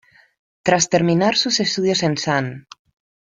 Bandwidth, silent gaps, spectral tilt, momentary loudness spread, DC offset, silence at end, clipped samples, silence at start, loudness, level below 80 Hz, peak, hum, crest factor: 9.4 kHz; none; -4 dB/octave; 8 LU; under 0.1%; 0.65 s; under 0.1%; 0.65 s; -18 LUFS; -58 dBFS; -2 dBFS; none; 18 dB